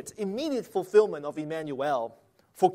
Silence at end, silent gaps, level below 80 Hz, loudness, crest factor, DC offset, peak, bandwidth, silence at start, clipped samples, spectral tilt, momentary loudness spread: 0 s; none; -74 dBFS; -28 LUFS; 18 dB; under 0.1%; -10 dBFS; 15 kHz; 0 s; under 0.1%; -5.5 dB/octave; 11 LU